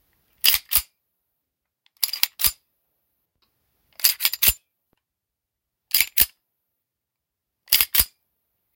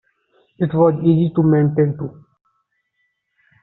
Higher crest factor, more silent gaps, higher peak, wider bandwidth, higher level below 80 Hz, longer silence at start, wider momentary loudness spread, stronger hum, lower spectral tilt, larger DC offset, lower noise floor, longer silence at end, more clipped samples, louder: first, 26 dB vs 18 dB; neither; about the same, 0 dBFS vs -2 dBFS; first, 18 kHz vs 4.1 kHz; first, -48 dBFS vs -58 dBFS; second, 0.45 s vs 0.6 s; second, 7 LU vs 11 LU; neither; second, 1.5 dB/octave vs -10 dB/octave; neither; first, -84 dBFS vs -70 dBFS; second, 0.7 s vs 1.5 s; neither; about the same, -19 LUFS vs -17 LUFS